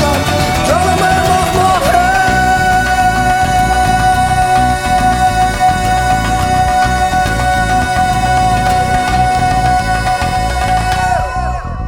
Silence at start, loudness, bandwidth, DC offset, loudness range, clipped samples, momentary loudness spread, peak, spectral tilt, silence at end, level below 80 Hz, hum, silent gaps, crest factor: 0 s; -12 LUFS; 17.5 kHz; under 0.1%; 2 LU; under 0.1%; 3 LU; 0 dBFS; -4.5 dB/octave; 0 s; -22 dBFS; none; none; 12 dB